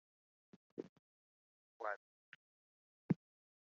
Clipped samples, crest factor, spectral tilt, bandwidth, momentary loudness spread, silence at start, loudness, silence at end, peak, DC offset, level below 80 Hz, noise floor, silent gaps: under 0.1%; 28 dB; -8 dB/octave; 6.6 kHz; 23 LU; 0.8 s; -46 LUFS; 0.55 s; -22 dBFS; under 0.1%; -88 dBFS; under -90 dBFS; 0.89-1.80 s, 1.96-3.09 s